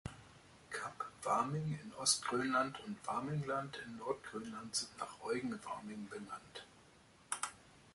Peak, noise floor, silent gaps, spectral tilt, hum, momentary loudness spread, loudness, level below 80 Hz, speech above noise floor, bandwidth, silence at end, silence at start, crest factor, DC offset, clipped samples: -20 dBFS; -65 dBFS; none; -3.5 dB/octave; none; 14 LU; -40 LUFS; -70 dBFS; 24 dB; 11.5 kHz; 0.05 s; 0.05 s; 22 dB; under 0.1%; under 0.1%